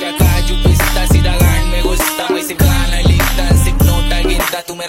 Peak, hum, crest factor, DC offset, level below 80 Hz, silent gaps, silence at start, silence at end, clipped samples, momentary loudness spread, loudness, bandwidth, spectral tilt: 0 dBFS; none; 12 dB; under 0.1%; -14 dBFS; none; 0 s; 0 s; under 0.1%; 4 LU; -13 LUFS; 16.5 kHz; -4.5 dB/octave